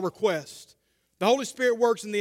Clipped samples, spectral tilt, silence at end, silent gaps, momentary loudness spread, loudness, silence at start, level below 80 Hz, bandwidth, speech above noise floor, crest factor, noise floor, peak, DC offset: under 0.1%; -4 dB/octave; 0 s; none; 15 LU; -25 LUFS; 0 s; -76 dBFS; 16 kHz; 39 dB; 18 dB; -65 dBFS; -8 dBFS; under 0.1%